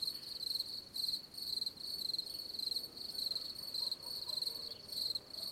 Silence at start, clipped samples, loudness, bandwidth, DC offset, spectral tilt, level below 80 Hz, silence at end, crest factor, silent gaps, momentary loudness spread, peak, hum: 0 s; under 0.1%; -39 LUFS; 16.5 kHz; under 0.1%; -0.5 dB/octave; -74 dBFS; 0 s; 16 dB; none; 3 LU; -26 dBFS; none